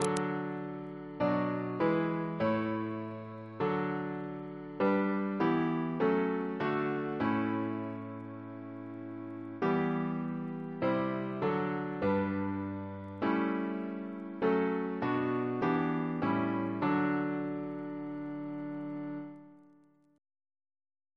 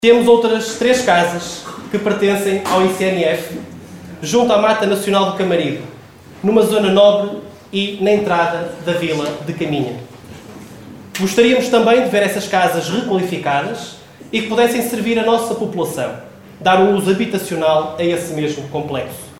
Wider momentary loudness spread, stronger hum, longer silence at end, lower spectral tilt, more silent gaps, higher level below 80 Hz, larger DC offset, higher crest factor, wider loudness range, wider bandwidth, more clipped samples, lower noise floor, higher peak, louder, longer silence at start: second, 12 LU vs 16 LU; neither; first, 1.55 s vs 0 s; first, -7.5 dB/octave vs -4.5 dB/octave; neither; second, -70 dBFS vs -54 dBFS; neither; first, 22 dB vs 16 dB; about the same, 4 LU vs 3 LU; second, 11 kHz vs 16.5 kHz; neither; first, -64 dBFS vs -39 dBFS; second, -12 dBFS vs 0 dBFS; second, -34 LUFS vs -16 LUFS; about the same, 0 s vs 0 s